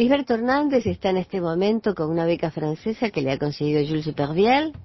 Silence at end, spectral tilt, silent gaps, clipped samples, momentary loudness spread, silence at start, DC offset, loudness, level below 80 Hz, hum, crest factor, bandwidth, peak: 0 s; -7.5 dB/octave; none; under 0.1%; 6 LU; 0 s; under 0.1%; -23 LUFS; -50 dBFS; none; 16 dB; 6.2 kHz; -6 dBFS